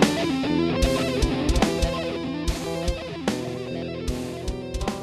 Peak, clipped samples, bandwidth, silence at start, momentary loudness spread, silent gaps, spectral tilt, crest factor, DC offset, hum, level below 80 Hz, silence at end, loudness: -4 dBFS; under 0.1%; 14 kHz; 0 s; 8 LU; none; -5 dB/octave; 20 dB; under 0.1%; none; -32 dBFS; 0 s; -26 LUFS